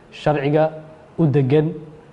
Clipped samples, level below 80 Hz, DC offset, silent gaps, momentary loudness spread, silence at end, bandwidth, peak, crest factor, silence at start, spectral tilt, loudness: under 0.1%; -52 dBFS; under 0.1%; none; 19 LU; 0.15 s; 7.4 kHz; -4 dBFS; 16 dB; 0.15 s; -9 dB/octave; -19 LUFS